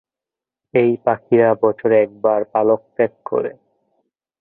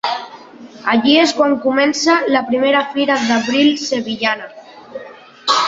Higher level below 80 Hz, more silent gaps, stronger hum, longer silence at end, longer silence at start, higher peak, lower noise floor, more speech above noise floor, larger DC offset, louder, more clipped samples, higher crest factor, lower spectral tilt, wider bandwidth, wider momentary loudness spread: about the same, -62 dBFS vs -60 dBFS; neither; neither; first, 0.9 s vs 0 s; first, 0.75 s vs 0.05 s; about the same, -2 dBFS vs -2 dBFS; first, -88 dBFS vs -37 dBFS; first, 71 dB vs 22 dB; neither; about the same, -17 LUFS vs -15 LUFS; neither; about the same, 16 dB vs 14 dB; first, -12 dB/octave vs -3 dB/octave; second, 3.9 kHz vs 7.8 kHz; second, 8 LU vs 21 LU